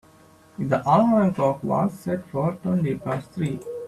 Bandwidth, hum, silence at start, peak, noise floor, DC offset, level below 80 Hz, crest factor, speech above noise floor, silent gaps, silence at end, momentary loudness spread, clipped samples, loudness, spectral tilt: 13 kHz; none; 0.6 s; -6 dBFS; -53 dBFS; under 0.1%; -58 dBFS; 18 dB; 30 dB; none; 0 s; 11 LU; under 0.1%; -23 LUFS; -8.5 dB/octave